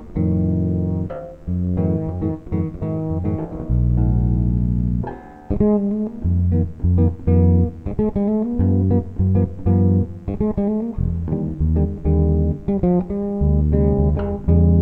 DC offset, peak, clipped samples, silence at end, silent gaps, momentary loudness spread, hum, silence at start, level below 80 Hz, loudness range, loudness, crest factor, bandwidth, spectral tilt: 0.1%; -4 dBFS; under 0.1%; 0 s; none; 7 LU; none; 0 s; -26 dBFS; 4 LU; -20 LUFS; 14 dB; 2.6 kHz; -13 dB/octave